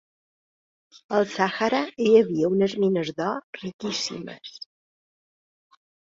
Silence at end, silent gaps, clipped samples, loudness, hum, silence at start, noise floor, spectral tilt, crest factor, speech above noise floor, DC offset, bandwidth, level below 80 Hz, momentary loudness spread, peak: 1.45 s; 3.43-3.53 s, 3.73-3.79 s; under 0.1%; -24 LUFS; none; 1.1 s; under -90 dBFS; -5 dB/octave; 20 dB; over 66 dB; under 0.1%; 7.8 kHz; -68 dBFS; 20 LU; -6 dBFS